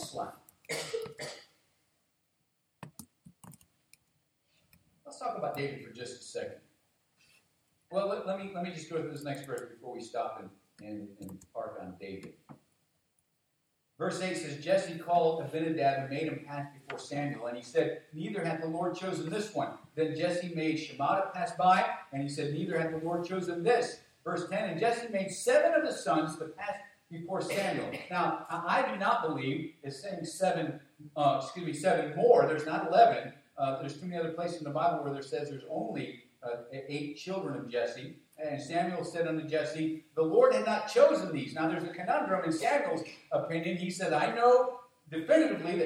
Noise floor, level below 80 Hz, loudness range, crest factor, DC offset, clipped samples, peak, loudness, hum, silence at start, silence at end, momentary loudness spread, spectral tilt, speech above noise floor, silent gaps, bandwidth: -78 dBFS; -80 dBFS; 14 LU; 22 dB; under 0.1%; under 0.1%; -10 dBFS; -32 LUFS; none; 0 s; 0 s; 18 LU; -5.5 dB/octave; 47 dB; none; 15.5 kHz